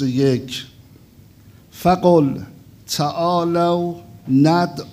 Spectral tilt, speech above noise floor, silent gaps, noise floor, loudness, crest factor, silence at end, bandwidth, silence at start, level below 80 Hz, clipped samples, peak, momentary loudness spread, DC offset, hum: -6.5 dB/octave; 30 dB; none; -47 dBFS; -18 LUFS; 16 dB; 0 s; 16 kHz; 0 s; -52 dBFS; under 0.1%; -2 dBFS; 16 LU; under 0.1%; none